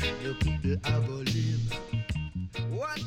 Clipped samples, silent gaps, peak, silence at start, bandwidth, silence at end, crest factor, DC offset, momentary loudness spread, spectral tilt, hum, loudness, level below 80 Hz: under 0.1%; none; -16 dBFS; 0 s; 14 kHz; 0 s; 14 dB; under 0.1%; 6 LU; -6 dB/octave; none; -31 LUFS; -40 dBFS